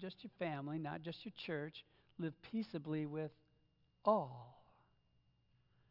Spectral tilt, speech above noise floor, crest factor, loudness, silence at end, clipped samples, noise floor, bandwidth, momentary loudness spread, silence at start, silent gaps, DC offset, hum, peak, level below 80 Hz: -5.5 dB/octave; 34 dB; 24 dB; -43 LUFS; 1.3 s; under 0.1%; -77 dBFS; 5.8 kHz; 14 LU; 0 s; none; under 0.1%; none; -22 dBFS; -82 dBFS